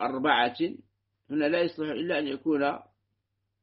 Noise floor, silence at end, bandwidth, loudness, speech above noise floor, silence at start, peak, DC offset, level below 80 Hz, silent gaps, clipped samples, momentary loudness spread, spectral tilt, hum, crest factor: -80 dBFS; 0.8 s; 5.6 kHz; -28 LUFS; 52 dB; 0 s; -8 dBFS; under 0.1%; -74 dBFS; none; under 0.1%; 9 LU; -2.5 dB/octave; none; 20 dB